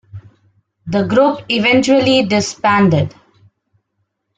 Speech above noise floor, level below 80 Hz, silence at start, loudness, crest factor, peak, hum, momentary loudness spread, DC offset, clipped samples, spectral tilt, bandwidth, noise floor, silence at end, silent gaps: 57 dB; -50 dBFS; 0.15 s; -14 LUFS; 14 dB; -2 dBFS; none; 8 LU; under 0.1%; under 0.1%; -5 dB/octave; 9.4 kHz; -70 dBFS; 1.3 s; none